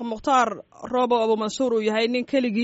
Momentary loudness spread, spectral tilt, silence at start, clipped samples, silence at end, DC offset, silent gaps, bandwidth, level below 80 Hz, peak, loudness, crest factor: 5 LU; -3 dB/octave; 0 s; under 0.1%; 0 s; under 0.1%; none; 8 kHz; -60 dBFS; -8 dBFS; -23 LUFS; 14 dB